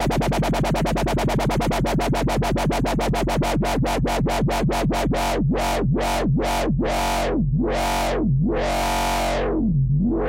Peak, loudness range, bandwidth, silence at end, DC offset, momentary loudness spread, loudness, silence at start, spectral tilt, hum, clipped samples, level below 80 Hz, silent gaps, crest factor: -12 dBFS; 0 LU; 16 kHz; 0 s; under 0.1%; 1 LU; -22 LUFS; 0 s; -6 dB/octave; none; under 0.1%; -28 dBFS; none; 8 dB